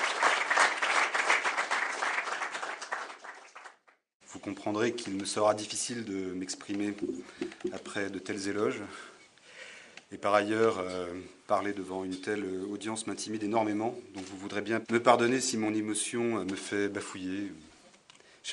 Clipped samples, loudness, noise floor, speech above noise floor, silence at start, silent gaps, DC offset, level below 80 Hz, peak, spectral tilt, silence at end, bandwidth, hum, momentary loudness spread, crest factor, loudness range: under 0.1%; -31 LUFS; -61 dBFS; 29 dB; 0 s; 4.14-4.20 s; under 0.1%; -76 dBFS; -8 dBFS; -3 dB/octave; 0 s; 11 kHz; none; 18 LU; 24 dB; 6 LU